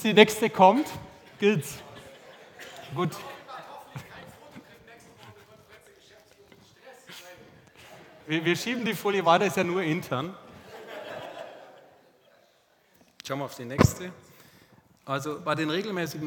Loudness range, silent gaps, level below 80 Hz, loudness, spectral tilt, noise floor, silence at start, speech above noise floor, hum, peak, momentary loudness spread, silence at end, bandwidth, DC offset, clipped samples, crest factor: 22 LU; none; -56 dBFS; -26 LUFS; -5 dB/octave; -64 dBFS; 0 s; 39 dB; none; -2 dBFS; 28 LU; 0 s; over 20 kHz; under 0.1%; under 0.1%; 28 dB